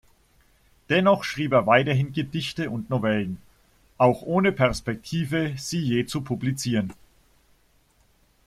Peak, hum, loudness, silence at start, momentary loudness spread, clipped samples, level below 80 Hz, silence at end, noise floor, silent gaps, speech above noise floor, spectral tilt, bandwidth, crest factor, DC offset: -4 dBFS; none; -24 LUFS; 0.9 s; 9 LU; under 0.1%; -52 dBFS; 1.55 s; -62 dBFS; none; 39 dB; -6 dB/octave; 15 kHz; 20 dB; under 0.1%